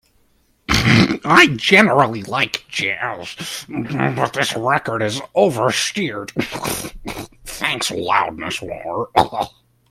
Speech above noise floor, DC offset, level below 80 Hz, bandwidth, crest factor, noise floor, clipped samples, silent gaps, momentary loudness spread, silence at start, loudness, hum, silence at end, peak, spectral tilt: 41 dB; under 0.1%; -42 dBFS; 16 kHz; 18 dB; -59 dBFS; under 0.1%; none; 16 LU; 0.7 s; -17 LUFS; none; 0.45 s; 0 dBFS; -4 dB/octave